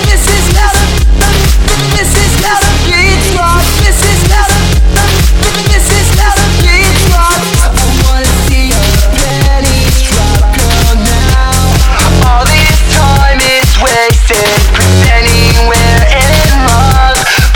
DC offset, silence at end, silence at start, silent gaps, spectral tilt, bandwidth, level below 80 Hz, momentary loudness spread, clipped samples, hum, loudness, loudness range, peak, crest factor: under 0.1%; 0 s; 0 s; none; -4 dB/octave; 19 kHz; -8 dBFS; 3 LU; 2%; none; -7 LUFS; 2 LU; 0 dBFS; 6 dB